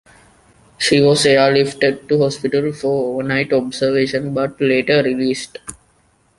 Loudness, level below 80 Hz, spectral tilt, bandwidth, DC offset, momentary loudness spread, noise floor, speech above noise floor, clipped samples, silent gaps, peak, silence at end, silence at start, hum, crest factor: -16 LUFS; -54 dBFS; -5 dB/octave; 11.5 kHz; under 0.1%; 9 LU; -57 dBFS; 41 dB; under 0.1%; none; -2 dBFS; 0.65 s; 0.8 s; none; 16 dB